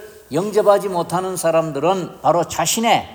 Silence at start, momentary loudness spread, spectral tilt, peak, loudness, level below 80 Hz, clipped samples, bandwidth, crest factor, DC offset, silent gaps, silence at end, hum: 0 s; 6 LU; -4 dB/octave; -2 dBFS; -18 LUFS; -56 dBFS; under 0.1%; over 20 kHz; 18 dB; under 0.1%; none; 0 s; none